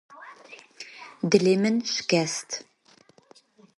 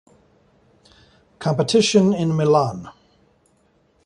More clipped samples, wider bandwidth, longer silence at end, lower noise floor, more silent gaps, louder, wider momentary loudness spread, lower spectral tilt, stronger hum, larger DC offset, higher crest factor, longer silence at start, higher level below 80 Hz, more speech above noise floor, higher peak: neither; about the same, 11.5 kHz vs 11.5 kHz; about the same, 1.15 s vs 1.15 s; about the same, -58 dBFS vs -61 dBFS; neither; second, -24 LUFS vs -18 LUFS; first, 25 LU vs 11 LU; about the same, -4.5 dB/octave vs -5.5 dB/octave; neither; neither; first, 24 dB vs 18 dB; second, 0.1 s vs 1.4 s; second, -70 dBFS vs -58 dBFS; second, 35 dB vs 43 dB; about the same, -4 dBFS vs -2 dBFS